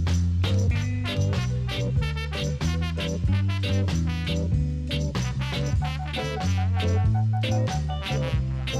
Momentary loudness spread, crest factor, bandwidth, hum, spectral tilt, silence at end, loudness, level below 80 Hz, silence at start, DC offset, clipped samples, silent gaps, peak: 4 LU; 12 dB; 12 kHz; none; -6 dB/octave; 0 s; -26 LUFS; -32 dBFS; 0 s; under 0.1%; under 0.1%; none; -12 dBFS